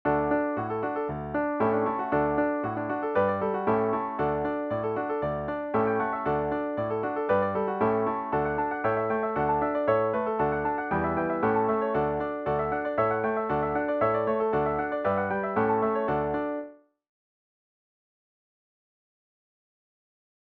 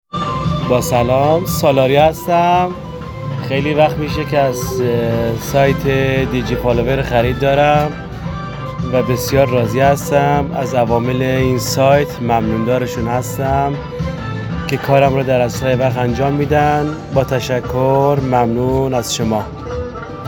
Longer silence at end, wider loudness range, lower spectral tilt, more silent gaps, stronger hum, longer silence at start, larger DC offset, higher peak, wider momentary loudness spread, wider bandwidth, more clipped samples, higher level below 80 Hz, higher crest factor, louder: first, 3.8 s vs 0 s; about the same, 3 LU vs 2 LU; first, -10 dB/octave vs -6 dB/octave; neither; neither; about the same, 0.05 s vs 0.15 s; neither; second, -12 dBFS vs 0 dBFS; second, 5 LU vs 10 LU; second, 4.6 kHz vs 19 kHz; neither; second, -52 dBFS vs -34 dBFS; about the same, 16 dB vs 14 dB; second, -27 LUFS vs -15 LUFS